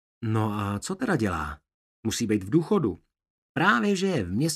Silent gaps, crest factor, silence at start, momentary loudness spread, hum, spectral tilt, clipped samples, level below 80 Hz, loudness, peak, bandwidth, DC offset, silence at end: 1.74-2.03 s, 3.30-3.55 s; 20 dB; 0.2 s; 13 LU; none; -5.5 dB/octave; under 0.1%; -52 dBFS; -26 LUFS; -8 dBFS; 15 kHz; under 0.1%; 0 s